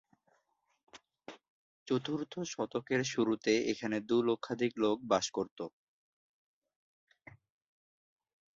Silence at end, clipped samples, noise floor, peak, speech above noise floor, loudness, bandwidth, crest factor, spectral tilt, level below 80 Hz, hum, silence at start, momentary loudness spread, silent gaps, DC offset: 2.9 s; under 0.1%; -77 dBFS; -14 dBFS; 44 dB; -34 LUFS; 7.8 kHz; 22 dB; -4.5 dB/octave; -76 dBFS; none; 0.95 s; 15 LU; 1.50-1.86 s, 5.51-5.56 s; under 0.1%